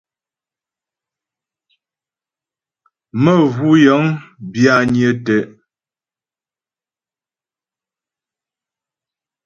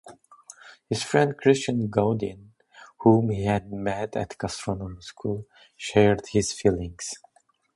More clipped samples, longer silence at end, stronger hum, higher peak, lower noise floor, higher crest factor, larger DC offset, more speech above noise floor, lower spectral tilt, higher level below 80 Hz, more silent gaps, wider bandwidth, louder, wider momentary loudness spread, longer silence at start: neither; first, 4 s vs 0.6 s; neither; first, 0 dBFS vs -4 dBFS; first, under -90 dBFS vs -52 dBFS; about the same, 18 dB vs 20 dB; neither; first, over 77 dB vs 28 dB; first, -7 dB/octave vs -5.5 dB/octave; second, -56 dBFS vs -50 dBFS; neither; second, 7.6 kHz vs 11.5 kHz; first, -13 LUFS vs -25 LUFS; about the same, 16 LU vs 15 LU; first, 3.15 s vs 0.05 s